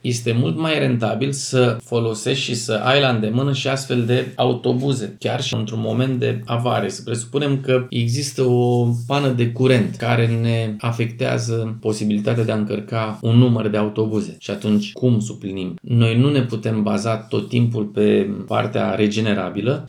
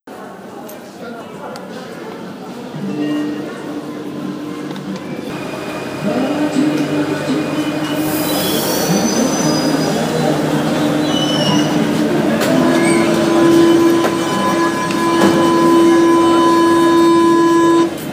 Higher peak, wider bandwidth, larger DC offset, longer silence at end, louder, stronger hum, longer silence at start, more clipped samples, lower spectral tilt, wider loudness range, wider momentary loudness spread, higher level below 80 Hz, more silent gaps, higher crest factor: about the same, -2 dBFS vs 0 dBFS; second, 12 kHz vs 16 kHz; neither; about the same, 0 s vs 0 s; second, -20 LUFS vs -14 LUFS; neither; about the same, 0.05 s vs 0.05 s; neither; about the same, -6 dB/octave vs -5 dB/octave; second, 2 LU vs 13 LU; second, 6 LU vs 18 LU; second, -66 dBFS vs -50 dBFS; neither; about the same, 16 dB vs 14 dB